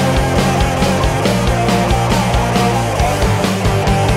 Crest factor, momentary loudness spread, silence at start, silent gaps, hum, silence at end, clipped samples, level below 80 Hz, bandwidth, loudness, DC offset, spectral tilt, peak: 12 dB; 1 LU; 0 s; none; none; 0 s; under 0.1%; -22 dBFS; 16 kHz; -14 LUFS; under 0.1%; -5.5 dB/octave; -2 dBFS